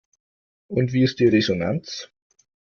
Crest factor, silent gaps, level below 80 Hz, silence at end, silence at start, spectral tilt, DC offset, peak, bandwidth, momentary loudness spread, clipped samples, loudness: 18 dB; none; -56 dBFS; 0.7 s; 0.7 s; -6.5 dB/octave; under 0.1%; -6 dBFS; 7 kHz; 16 LU; under 0.1%; -21 LUFS